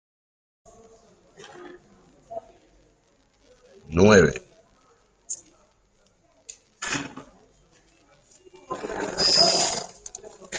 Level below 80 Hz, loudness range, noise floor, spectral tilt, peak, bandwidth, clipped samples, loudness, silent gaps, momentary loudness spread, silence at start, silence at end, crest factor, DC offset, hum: -54 dBFS; 13 LU; -64 dBFS; -3.5 dB/octave; -2 dBFS; 9.6 kHz; under 0.1%; -21 LUFS; none; 29 LU; 1.55 s; 0 s; 26 dB; under 0.1%; none